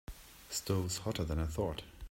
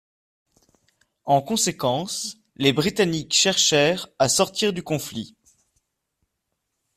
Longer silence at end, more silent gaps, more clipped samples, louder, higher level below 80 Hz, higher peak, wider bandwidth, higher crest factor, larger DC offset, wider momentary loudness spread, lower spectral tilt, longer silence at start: second, 0.05 s vs 1.7 s; neither; neither; second, -37 LUFS vs -21 LUFS; first, -48 dBFS vs -60 dBFS; second, -20 dBFS vs -4 dBFS; about the same, 16 kHz vs 16 kHz; about the same, 16 dB vs 20 dB; neither; about the same, 13 LU vs 15 LU; first, -5 dB/octave vs -3 dB/octave; second, 0.1 s vs 1.25 s